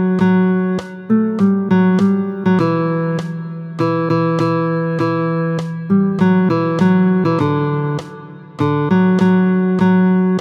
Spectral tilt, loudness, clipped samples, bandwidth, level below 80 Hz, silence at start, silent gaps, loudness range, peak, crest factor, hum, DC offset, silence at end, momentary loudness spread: -9 dB/octave; -15 LUFS; under 0.1%; 6.6 kHz; -56 dBFS; 0 s; none; 2 LU; -2 dBFS; 12 dB; none; under 0.1%; 0 s; 9 LU